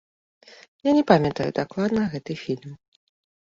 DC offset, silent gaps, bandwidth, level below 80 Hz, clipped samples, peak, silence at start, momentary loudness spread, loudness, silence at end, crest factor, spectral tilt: under 0.1%; none; 7.6 kHz; -56 dBFS; under 0.1%; -2 dBFS; 0.85 s; 14 LU; -23 LUFS; 0.75 s; 24 dB; -7.5 dB/octave